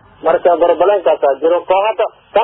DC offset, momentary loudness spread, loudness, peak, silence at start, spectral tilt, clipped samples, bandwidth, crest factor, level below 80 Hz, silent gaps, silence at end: under 0.1%; 5 LU; -13 LUFS; -2 dBFS; 0.25 s; -8.5 dB/octave; under 0.1%; 4 kHz; 12 dB; -52 dBFS; none; 0 s